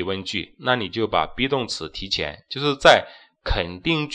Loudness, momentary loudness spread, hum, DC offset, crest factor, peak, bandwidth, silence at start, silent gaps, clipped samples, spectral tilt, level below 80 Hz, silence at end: -22 LUFS; 13 LU; none; under 0.1%; 22 dB; 0 dBFS; 10 kHz; 0 s; none; under 0.1%; -4.5 dB/octave; -38 dBFS; 0 s